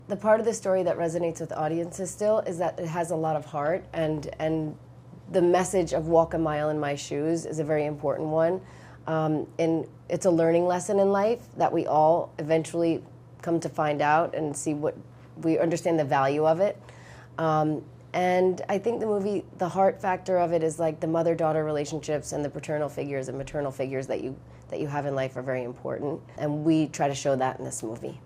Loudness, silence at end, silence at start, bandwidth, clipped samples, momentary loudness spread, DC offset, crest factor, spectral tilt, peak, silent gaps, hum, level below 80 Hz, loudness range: -27 LUFS; 0 s; 0 s; 15 kHz; under 0.1%; 10 LU; under 0.1%; 18 dB; -6 dB/octave; -8 dBFS; none; none; -58 dBFS; 5 LU